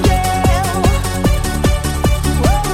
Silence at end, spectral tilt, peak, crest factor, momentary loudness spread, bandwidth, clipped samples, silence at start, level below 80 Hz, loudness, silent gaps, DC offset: 0 s; -5 dB/octave; -2 dBFS; 12 dB; 2 LU; 17 kHz; under 0.1%; 0 s; -18 dBFS; -15 LUFS; none; under 0.1%